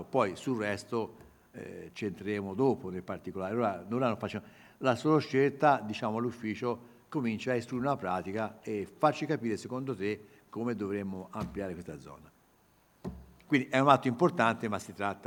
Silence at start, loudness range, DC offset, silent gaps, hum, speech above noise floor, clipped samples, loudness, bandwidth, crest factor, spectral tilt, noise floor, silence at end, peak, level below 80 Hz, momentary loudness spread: 0 s; 7 LU; under 0.1%; none; none; 34 dB; under 0.1%; -32 LUFS; over 20 kHz; 26 dB; -6.5 dB/octave; -66 dBFS; 0 s; -6 dBFS; -64 dBFS; 16 LU